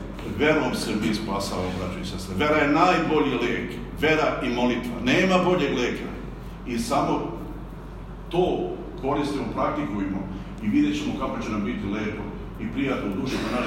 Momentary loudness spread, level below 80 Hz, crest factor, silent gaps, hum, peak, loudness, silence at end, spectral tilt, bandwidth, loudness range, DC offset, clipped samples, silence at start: 14 LU; -40 dBFS; 20 dB; none; none; -6 dBFS; -25 LUFS; 0 s; -5.5 dB/octave; 16 kHz; 5 LU; under 0.1%; under 0.1%; 0 s